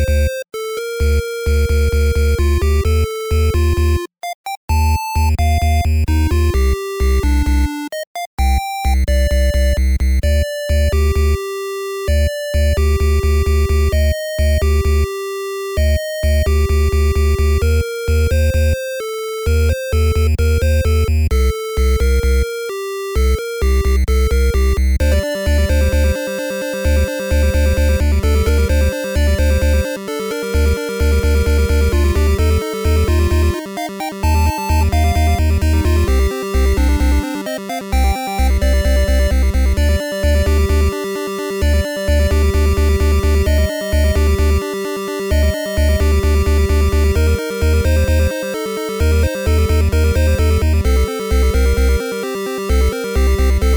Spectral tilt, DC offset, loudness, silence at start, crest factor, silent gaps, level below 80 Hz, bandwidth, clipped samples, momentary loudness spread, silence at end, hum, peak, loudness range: -6 dB/octave; under 0.1%; -16 LUFS; 0 s; 10 dB; 4.35-4.44 s, 4.57-4.68 s, 8.07-8.15 s, 8.26-8.37 s; -16 dBFS; over 20 kHz; under 0.1%; 7 LU; 0 s; none; -4 dBFS; 1 LU